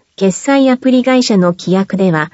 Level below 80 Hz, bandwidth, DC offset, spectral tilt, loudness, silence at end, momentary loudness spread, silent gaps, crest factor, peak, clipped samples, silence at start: -58 dBFS; 8 kHz; under 0.1%; -5.5 dB/octave; -12 LUFS; 0.05 s; 5 LU; none; 12 dB; 0 dBFS; under 0.1%; 0.2 s